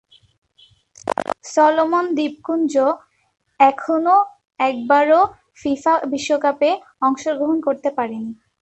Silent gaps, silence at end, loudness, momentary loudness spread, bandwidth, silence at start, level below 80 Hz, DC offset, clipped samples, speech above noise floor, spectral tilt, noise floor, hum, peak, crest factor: none; 0.3 s; -18 LUFS; 11 LU; 11 kHz; 1.05 s; -62 dBFS; under 0.1%; under 0.1%; 37 dB; -4 dB/octave; -55 dBFS; none; -2 dBFS; 16 dB